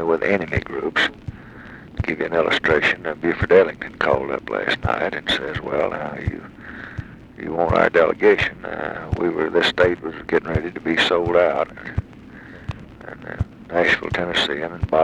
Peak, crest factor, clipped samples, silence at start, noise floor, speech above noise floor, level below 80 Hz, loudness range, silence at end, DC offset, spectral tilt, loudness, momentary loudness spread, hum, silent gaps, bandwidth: -2 dBFS; 20 dB; under 0.1%; 0 s; -40 dBFS; 20 dB; -40 dBFS; 4 LU; 0 s; under 0.1%; -5.5 dB/octave; -20 LUFS; 19 LU; none; none; 11.5 kHz